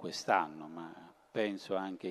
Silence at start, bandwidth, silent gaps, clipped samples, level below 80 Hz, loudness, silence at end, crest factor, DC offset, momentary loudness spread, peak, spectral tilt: 0 s; 13 kHz; none; under 0.1%; -82 dBFS; -36 LUFS; 0 s; 24 dB; under 0.1%; 16 LU; -12 dBFS; -4 dB/octave